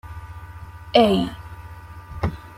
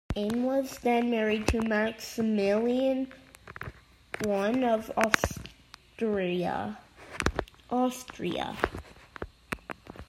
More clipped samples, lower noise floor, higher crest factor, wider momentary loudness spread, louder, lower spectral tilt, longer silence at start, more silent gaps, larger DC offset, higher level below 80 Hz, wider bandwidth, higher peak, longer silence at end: neither; second, -39 dBFS vs -54 dBFS; second, 22 dB vs 30 dB; first, 23 LU vs 17 LU; first, -21 LUFS vs -29 LUFS; first, -6.5 dB/octave vs -5 dB/octave; about the same, 0.05 s vs 0.1 s; neither; neither; first, -42 dBFS vs -48 dBFS; about the same, 16 kHz vs 16 kHz; about the same, -2 dBFS vs 0 dBFS; about the same, 0.05 s vs 0.05 s